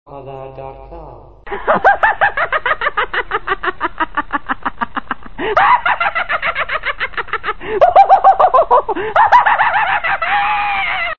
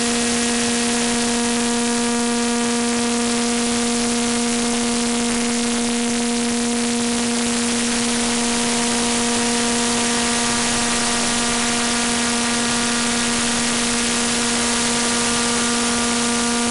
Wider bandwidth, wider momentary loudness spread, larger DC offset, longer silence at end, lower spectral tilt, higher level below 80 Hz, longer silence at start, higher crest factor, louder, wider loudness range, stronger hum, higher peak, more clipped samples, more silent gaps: second, 6.8 kHz vs 12 kHz; first, 16 LU vs 2 LU; first, 3% vs under 0.1%; about the same, 0 s vs 0 s; first, -5 dB/octave vs -1.5 dB/octave; about the same, -40 dBFS vs -44 dBFS; about the same, 0.05 s vs 0 s; about the same, 14 dB vs 12 dB; first, -14 LUFS vs -18 LUFS; first, 6 LU vs 2 LU; neither; first, 0 dBFS vs -8 dBFS; neither; neither